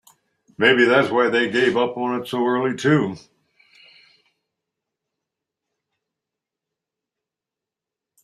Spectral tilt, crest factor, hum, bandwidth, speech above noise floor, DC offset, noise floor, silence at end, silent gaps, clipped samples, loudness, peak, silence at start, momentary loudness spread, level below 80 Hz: -5.5 dB/octave; 22 dB; none; 13 kHz; 69 dB; under 0.1%; -87 dBFS; 5.05 s; none; under 0.1%; -19 LUFS; -2 dBFS; 0.6 s; 9 LU; -66 dBFS